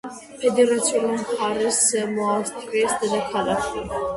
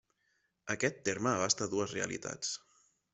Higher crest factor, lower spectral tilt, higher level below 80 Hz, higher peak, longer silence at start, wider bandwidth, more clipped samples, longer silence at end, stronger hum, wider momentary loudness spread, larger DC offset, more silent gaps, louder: second, 16 dB vs 22 dB; about the same, -3 dB/octave vs -3 dB/octave; first, -52 dBFS vs -72 dBFS; first, -6 dBFS vs -14 dBFS; second, 0.05 s vs 0.65 s; first, 11.5 kHz vs 8.2 kHz; neither; second, 0 s vs 0.55 s; neither; about the same, 7 LU vs 9 LU; neither; neither; first, -22 LUFS vs -34 LUFS